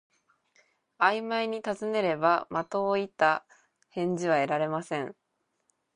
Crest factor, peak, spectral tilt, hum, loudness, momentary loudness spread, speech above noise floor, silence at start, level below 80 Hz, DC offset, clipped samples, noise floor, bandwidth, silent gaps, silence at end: 20 dB; -8 dBFS; -5.5 dB/octave; none; -28 LUFS; 8 LU; 51 dB; 1 s; -76 dBFS; under 0.1%; under 0.1%; -78 dBFS; 10.5 kHz; none; 0.85 s